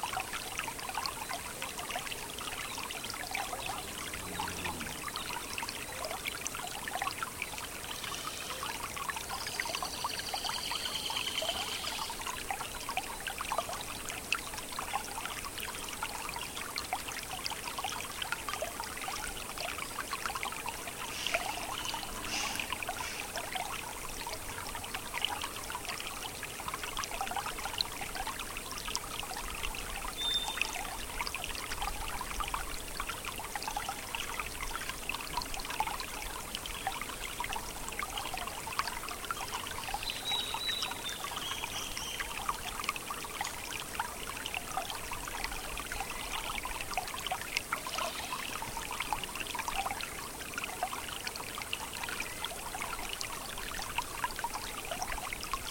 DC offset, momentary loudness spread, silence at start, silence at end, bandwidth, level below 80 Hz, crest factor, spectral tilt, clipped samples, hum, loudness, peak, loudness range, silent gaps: under 0.1%; 5 LU; 0 s; 0 s; 17 kHz; -50 dBFS; 28 dB; -1 dB/octave; under 0.1%; none; -37 LUFS; -10 dBFS; 2 LU; none